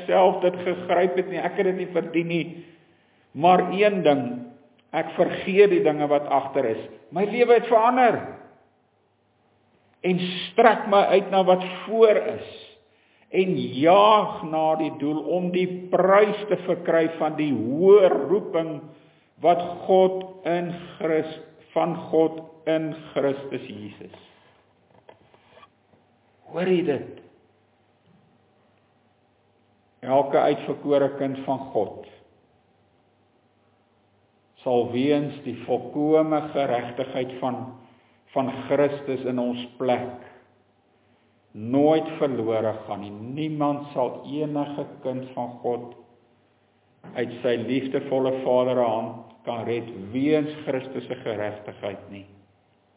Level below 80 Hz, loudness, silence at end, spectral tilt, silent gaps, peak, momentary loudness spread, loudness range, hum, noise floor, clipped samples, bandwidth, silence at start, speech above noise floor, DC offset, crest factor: -70 dBFS; -23 LUFS; 0.75 s; -10 dB/octave; none; -4 dBFS; 16 LU; 10 LU; none; -66 dBFS; under 0.1%; 4 kHz; 0 s; 43 dB; under 0.1%; 20 dB